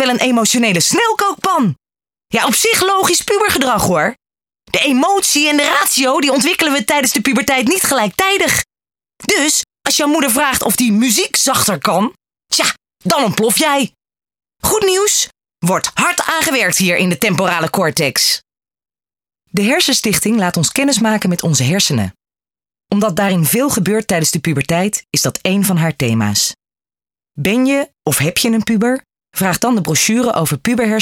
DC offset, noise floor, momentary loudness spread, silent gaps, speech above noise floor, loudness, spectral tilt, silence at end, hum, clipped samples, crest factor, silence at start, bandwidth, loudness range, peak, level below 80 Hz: under 0.1%; under -90 dBFS; 6 LU; none; over 76 dB; -13 LUFS; -3 dB/octave; 0 s; none; under 0.1%; 14 dB; 0 s; 19 kHz; 3 LU; 0 dBFS; -48 dBFS